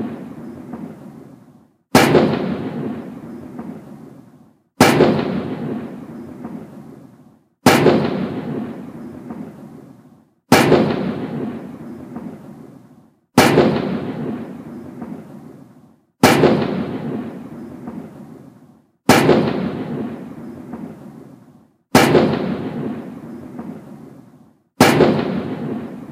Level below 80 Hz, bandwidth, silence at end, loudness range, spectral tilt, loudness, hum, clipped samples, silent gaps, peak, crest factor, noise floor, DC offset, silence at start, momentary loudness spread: -52 dBFS; 16 kHz; 0 s; 1 LU; -5 dB/octave; -17 LUFS; none; under 0.1%; none; 0 dBFS; 20 dB; -50 dBFS; under 0.1%; 0 s; 23 LU